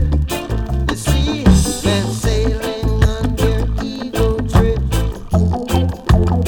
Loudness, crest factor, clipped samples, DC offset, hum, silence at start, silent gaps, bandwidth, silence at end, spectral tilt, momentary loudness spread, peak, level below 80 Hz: -17 LUFS; 12 dB; under 0.1%; under 0.1%; none; 0 s; none; 19 kHz; 0 s; -6 dB/octave; 6 LU; -2 dBFS; -20 dBFS